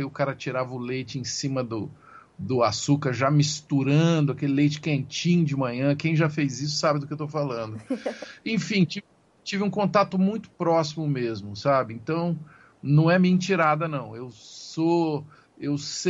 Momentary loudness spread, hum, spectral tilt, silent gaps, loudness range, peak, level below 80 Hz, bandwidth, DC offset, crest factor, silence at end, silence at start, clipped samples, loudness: 12 LU; none; -6 dB/octave; none; 4 LU; -8 dBFS; -64 dBFS; 8 kHz; under 0.1%; 18 dB; 0 s; 0 s; under 0.1%; -25 LUFS